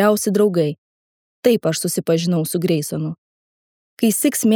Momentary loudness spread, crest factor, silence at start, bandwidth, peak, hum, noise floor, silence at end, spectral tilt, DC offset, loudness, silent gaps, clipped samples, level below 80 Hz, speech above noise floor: 9 LU; 18 dB; 0 s; 19.5 kHz; -2 dBFS; none; under -90 dBFS; 0 s; -5 dB/octave; under 0.1%; -19 LUFS; 0.78-1.43 s, 3.18-3.97 s; under 0.1%; -68 dBFS; over 73 dB